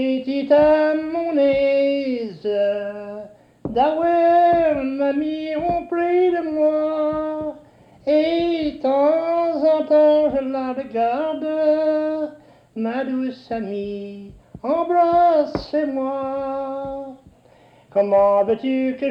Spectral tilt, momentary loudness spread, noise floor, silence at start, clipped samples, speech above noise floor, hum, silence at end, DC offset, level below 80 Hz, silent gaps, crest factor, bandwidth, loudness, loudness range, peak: -7.5 dB/octave; 14 LU; -51 dBFS; 0 s; under 0.1%; 33 dB; none; 0 s; under 0.1%; -52 dBFS; none; 14 dB; 5.8 kHz; -20 LUFS; 4 LU; -6 dBFS